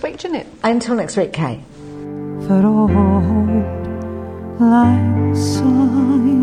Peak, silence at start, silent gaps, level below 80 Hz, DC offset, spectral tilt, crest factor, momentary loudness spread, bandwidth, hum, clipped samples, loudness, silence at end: -2 dBFS; 0 s; none; -38 dBFS; under 0.1%; -7.5 dB/octave; 12 dB; 15 LU; 11.5 kHz; none; under 0.1%; -16 LUFS; 0 s